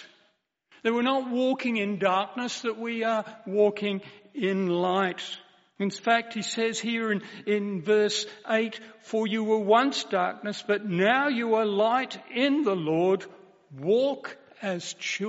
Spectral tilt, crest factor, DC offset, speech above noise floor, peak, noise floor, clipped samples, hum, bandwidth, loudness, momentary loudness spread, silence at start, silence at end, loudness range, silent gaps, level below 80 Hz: -3.5 dB/octave; 18 dB; under 0.1%; 43 dB; -8 dBFS; -69 dBFS; under 0.1%; none; 8 kHz; -27 LUFS; 9 LU; 0 s; 0 s; 3 LU; none; -80 dBFS